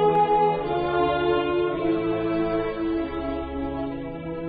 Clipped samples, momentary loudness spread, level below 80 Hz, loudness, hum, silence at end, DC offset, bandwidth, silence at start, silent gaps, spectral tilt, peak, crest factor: under 0.1%; 9 LU; -44 dBFS; -25 LUFS; none; 0 s; under 0.1%; 4.9 kHz; 0 s; none; -5 dB/octave; -10 dBFS; 14 dB